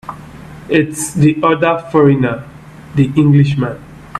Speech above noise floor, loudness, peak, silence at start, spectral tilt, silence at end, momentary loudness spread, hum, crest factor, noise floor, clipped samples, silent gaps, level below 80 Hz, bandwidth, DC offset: 21 dB; -13 LUFS; 0 dBFS; 0.05 s; -7 dB/octave; 0 s; 21 LU; none; 14 dB; -33 dBFS; under 0.1%; none; -44 dBFS; 12.5 kHz; under 0.1%